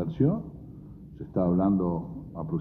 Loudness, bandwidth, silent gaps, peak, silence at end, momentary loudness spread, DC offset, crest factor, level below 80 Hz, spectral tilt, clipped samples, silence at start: -28 LUFS; 3.9 kHz; none; -12 dBFS; 0 s; 21 LU; under 0.1%; 16 dB; -50 dBFS; -12.5 dB/octave; under 0.1%; 0 s